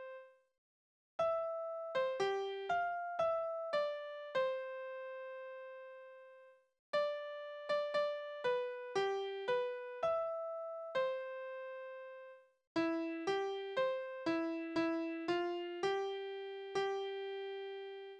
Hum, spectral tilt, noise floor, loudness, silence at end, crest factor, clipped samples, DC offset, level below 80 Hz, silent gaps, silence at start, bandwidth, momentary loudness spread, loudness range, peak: none; -4.5 dB/octave; -62 dBFS; -39 LUFS; 0 s; 16 dB; under 0.1%; under 0.1%; -82 dBFS; 0.58-1.19 s, 6.79-6.93 s, 12.67-12.75 s; 0 s; 9.8 kHz; 12 LU; 4 LU; -24 dBFS